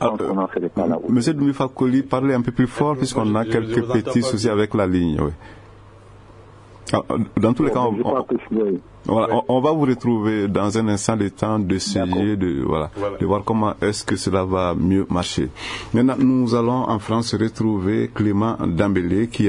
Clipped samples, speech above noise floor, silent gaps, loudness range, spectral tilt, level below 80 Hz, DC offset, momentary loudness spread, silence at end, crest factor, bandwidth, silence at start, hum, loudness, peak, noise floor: under 0.1%; 24 dB; none; 3 LU; -6.5 dB/octave; -46 dBFS; under 0.1%; 5 LU; 0 s; 18 dB; 11 kHz; 0 s; none; -20 LUFS; -2 dBFS; -44 dBFS